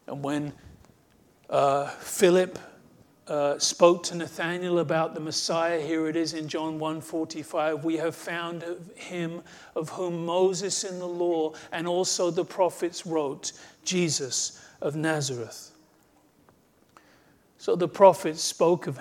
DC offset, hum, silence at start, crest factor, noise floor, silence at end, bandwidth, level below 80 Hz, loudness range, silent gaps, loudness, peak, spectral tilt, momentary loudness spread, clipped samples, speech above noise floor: under 0.1%; none; 0.1 s; 24 dB; -62 dBFS; 0 s; 18.5 kHz; -70 dBFS; 6 LU; none; -27 LUFS; -4 dBFS; -4 dB/octave; 13 LU; under 0.1%; 35 dB